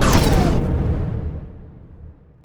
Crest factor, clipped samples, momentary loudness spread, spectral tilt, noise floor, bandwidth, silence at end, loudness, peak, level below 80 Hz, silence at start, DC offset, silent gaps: 18 dB; under 0.1%; 21 LU; -6 dB/octave; -42 dBFS; over 20 kHz; 0.35 s; -20 LUFS; 0 dBFS; -24 dBFS; 0 s; under 0.1%; none